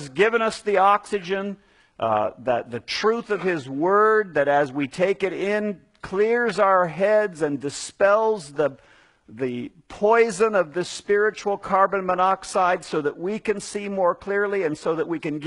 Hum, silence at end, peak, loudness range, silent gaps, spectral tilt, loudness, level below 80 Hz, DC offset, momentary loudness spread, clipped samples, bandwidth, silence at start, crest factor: none; 0 s; -4 dBFS; 2 LU; none; -4.5 dB/octave; -22 LUFS; -60 dBFS; under 0.1%; 10 LU; under 0.1%; 11 kHz; 0 s; 18 dB